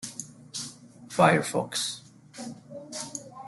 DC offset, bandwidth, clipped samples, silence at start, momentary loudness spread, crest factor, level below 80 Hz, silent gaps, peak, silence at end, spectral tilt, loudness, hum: under 0.1%; 12.5 kHz; under 0.1%; 0 s; 20 LU; 24 dB; -70 dBFS; none; -6 dBFS; 0 s; -4 dB/octave; -28 LUFS; none